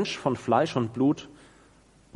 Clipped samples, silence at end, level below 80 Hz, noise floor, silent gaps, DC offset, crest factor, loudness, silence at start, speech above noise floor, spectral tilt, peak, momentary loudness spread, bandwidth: under 0.1%; 0.9 s; -62 dBFS; -58 dBFS; none; under 0.1%; 20 dB; -26 LUFS; 0 s; 32 dB; -6 dB/octave; -8 dBFS; 5 LU; 11 kHz